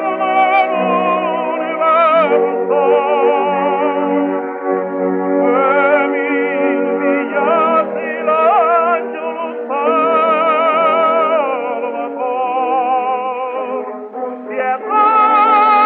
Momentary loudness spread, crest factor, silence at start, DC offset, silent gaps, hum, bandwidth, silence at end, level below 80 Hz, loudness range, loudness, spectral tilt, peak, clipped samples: 10 LU; 12 dB; 0 s; under 0.1%; none; none; 4.8 kHz; 0 s; -84 dBFS; 3 LU; -14 LUFS; -8.5 dB/octave; -2 dBFS; under 0.1%